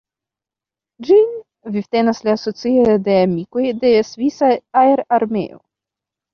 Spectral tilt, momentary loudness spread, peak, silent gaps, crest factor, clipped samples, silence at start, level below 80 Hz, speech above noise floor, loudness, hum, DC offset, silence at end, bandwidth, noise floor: -7 dB/octave; 11 LU; -2 dBFS; none; 14 dB; under 0.1%; 1 s; -56 dBFS; 73 dB; -16 LUFS; none; under 0.1%; 0.75 s; 6.8 kHz; -88 dBFS